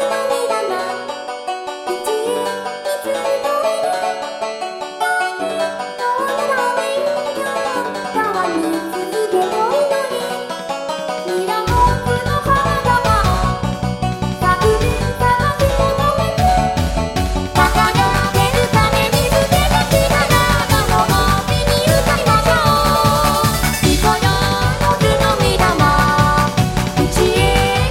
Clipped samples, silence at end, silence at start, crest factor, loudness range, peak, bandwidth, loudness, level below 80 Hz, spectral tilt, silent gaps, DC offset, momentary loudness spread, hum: under 0.1%; 0 s; 0 s; 16 dB; 6 LU; 0 dBFS; 17 kHz; -16 LUFS; -26 dBFS; -4.5 dB/octave; none; under 0.1%; 9 LU; none